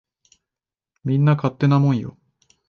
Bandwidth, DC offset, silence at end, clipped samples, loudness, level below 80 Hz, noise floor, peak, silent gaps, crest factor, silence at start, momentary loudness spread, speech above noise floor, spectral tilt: 6.4 kHz; under 0.1%; 0.6 s; under 0.1%; -19 LUFS; -60 dBFS; -89 dBFS; -6 dBFS; none; 16 dB; 1.05 s; 13 LU; 71 dB; -9 dB/octave